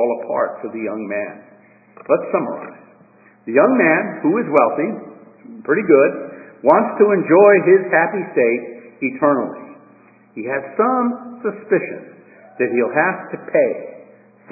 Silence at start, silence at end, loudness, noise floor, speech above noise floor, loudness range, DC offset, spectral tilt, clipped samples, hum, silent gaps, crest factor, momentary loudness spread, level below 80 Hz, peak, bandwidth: 0 s; 0.5 s; -17 LUFS; -50 dBFS; 33 dB; 8 LU; under 0.1%; -11.5 dB/octave; under 0.1%; none; none; 18 dB; 18 LU; -70 dBFS; 0 dBFS; 2.7 kHz